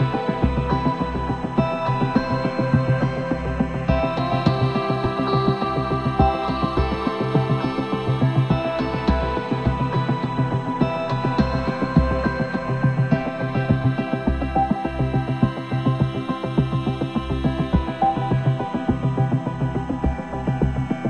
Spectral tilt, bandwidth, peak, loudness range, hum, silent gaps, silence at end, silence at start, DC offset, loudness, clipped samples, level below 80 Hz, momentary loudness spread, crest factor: -8.5 dB/octave; 8.4 kHz; -4 dBFS; 1 LU; none; none; 0 s; 0 s; 0.1%; -22 LUFS; under 0.1%; -32 dBFS; 4 LU; 18 dB